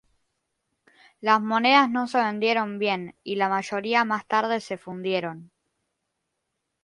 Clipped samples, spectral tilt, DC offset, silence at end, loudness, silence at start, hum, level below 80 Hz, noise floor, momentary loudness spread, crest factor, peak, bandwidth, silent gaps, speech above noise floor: under 0.1%; -4.5 dB/octave; under 0.1%; 1.4 s; -24 LUFS; 1.2 s; none; -76 dBFS; -80 dBFS; 12 LU; 20 dB; -6 dBFS; 11.5 kHz; none; 56 dB